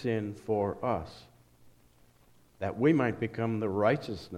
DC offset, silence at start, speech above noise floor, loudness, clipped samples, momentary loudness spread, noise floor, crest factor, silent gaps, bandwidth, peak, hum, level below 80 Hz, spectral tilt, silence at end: under 0.1%; 0 s; 33 dB; -30 LUFS; under 0.1%; 10 LU; -63 dBFS; 20 dB; none; 13 kHz; -12 dBFS; none; -60 dBFS; -8 dB/octave; 0 s